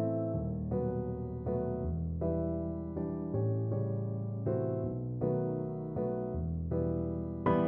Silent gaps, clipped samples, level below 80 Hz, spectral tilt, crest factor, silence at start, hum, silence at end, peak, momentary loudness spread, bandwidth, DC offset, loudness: none; under 0.1%; -48 dBFS; -12.5 dB/octave; 18 dB; 0 s; none; 0 s; -16 dBFS; 4 LU; 3.5 kHz; under 0.1%; -35 LUFS